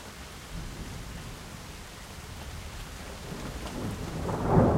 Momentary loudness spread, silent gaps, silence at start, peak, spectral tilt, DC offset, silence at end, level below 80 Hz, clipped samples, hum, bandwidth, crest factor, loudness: 11 LU; none; 0 s; -10 dBFS; -6.5 dB/octave; under 0.1%; 0 s; -42 dBFS; under 0.1%; none; 16 kHz; 24 dB; -36 LUFS